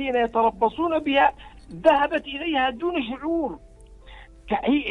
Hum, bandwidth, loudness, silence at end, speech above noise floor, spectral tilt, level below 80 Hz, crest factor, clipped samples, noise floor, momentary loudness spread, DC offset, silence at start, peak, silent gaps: none; 10.5 kHz; -23 LUFS; 0 s; 23 dB; -6 dB/octave; -48 dBFS; 20 dB; under 0.1%; -45 dBFS; 8 LU; under 0.1%; 0 s; -4 dBFS; none